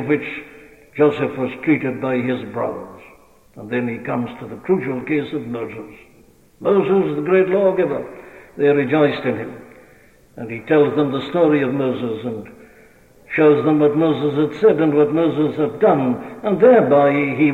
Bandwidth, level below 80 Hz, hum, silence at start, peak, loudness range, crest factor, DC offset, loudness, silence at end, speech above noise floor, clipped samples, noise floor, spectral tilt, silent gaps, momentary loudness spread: 6.6 kHz; -58 dBFS; none; 0 s; -2 dBFS; 8 LU; 16 dB; under 0.1%; -18 LUFS; 0 s; 33 dB; under 0.1%; -50 dBFS; -8.5 dB/octave; none; 15 LU